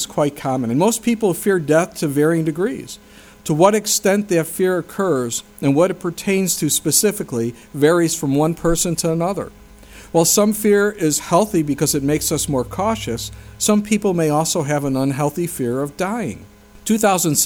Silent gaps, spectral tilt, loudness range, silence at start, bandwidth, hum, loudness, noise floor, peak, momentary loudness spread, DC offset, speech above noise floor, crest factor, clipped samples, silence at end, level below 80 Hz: none; -4.5 dB/octave; 2 LU; 0 s; over 20 kHz; none; -18 LUFS; -41 dBFS; 0 dBFS; 9 LU; under 0.1%; 23 dB; 18 dB; under 0.1%; 0 s; -44 dBFS